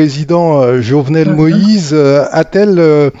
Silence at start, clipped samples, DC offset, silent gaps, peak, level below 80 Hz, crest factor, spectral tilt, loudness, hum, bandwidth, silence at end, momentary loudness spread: 0 s; under 0.1%; under 0.1%; none; 0 dBFS; -46 dBFS; 8 dB; -7.5 dB/octave; -9 LUFS; none; 8 kHz; 0.1 s; 3 LU